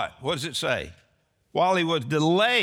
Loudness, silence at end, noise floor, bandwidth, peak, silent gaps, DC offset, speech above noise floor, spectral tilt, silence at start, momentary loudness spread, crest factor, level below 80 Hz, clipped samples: -24 LUFS; 0 s; -68 dBFS; 17 kHz; -10 dBFS; none; under 0.1%; 44 dB; -4.5 dB/octave; 0 s; 9 LU; 16 dB; -58 dBFS; under 0.1%